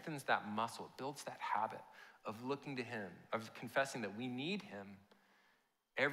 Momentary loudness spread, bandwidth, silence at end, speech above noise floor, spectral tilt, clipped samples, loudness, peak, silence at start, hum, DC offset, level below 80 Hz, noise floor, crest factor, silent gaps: 14 LU; 16 kHz; 0 s; 34 dB; -4.5 dB/octave; under 0.1%; -43 LUFS; -22 dBFS; 0 s; none; under 0.1%; under -90 dBFS; -78 dBFS; 22 dB; none